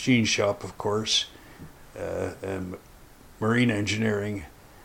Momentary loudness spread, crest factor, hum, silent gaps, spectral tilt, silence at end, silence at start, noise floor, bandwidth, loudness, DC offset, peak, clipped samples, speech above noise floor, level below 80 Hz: 21 LU; 20 dB; none; none; -4 dB/octave; 0 s; 0 s; -50 dBFS; 16.5 kHz; -26 LUFS; under 0.1%; -8 dBFS; under 0.1%; 24 dB; -54 dBFS